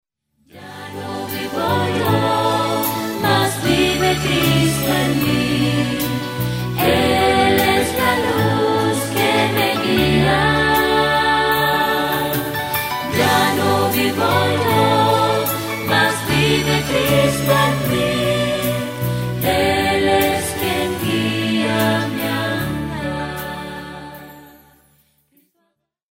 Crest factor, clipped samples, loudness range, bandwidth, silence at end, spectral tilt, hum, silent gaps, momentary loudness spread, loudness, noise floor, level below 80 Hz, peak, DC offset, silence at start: 16 dB; under 0.1%; 5 LU; 16.5 kHz; 1.65 s; -4.5 dB/octave; none; none; 9 LU; -17 LUFS; -69 dBFS; -40 dBFS; -2 dBFS; under 0.1%; 0.55 s